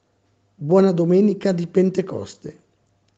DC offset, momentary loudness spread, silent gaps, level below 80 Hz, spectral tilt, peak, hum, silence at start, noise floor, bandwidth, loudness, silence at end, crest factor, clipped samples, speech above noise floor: under 0.1%; 19 LU; none; -64 dBFS; -8.5 dB/octave; -4 dBFS; none; 0.6 s; -64 dBFS; 8 kHz; -18 LUFS; 0.65 s; 16 dB; under 0.1%; 46 dB